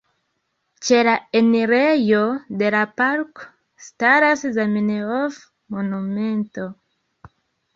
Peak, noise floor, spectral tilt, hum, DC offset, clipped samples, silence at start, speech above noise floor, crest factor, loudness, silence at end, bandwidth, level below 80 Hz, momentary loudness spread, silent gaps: -2 dBFS; -72 dBFS; -5 dB/octave; none; under 0.1%; under 0.1%; 0.8 s; 53 dB; 18 dB; -19 LUFS; 1 s; 7.6 kHz; -64 dBFS; 12 LU; none